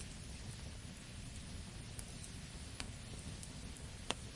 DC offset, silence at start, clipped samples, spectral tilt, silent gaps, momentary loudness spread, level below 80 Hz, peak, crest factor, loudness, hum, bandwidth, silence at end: under 0.1%; 0 s; under 0.1%; -3.5 dB/octave; none; 3 LU; -54 dBFS; -14 dBFS; 34 dB; -49 LUFS; none; 11.5 kHz; 0 s